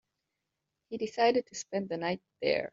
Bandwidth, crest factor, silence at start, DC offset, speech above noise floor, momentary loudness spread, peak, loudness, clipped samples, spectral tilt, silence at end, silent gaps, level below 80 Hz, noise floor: 7.8 kHz; 20 dB; 0.9 s; under 0.1%; 54 dB; 10 LU; -14 dBFS; -32 LUFS; under 0.1%; -3 dB/octave; 0.05 s; none; -72 dBFS; -85 dBFS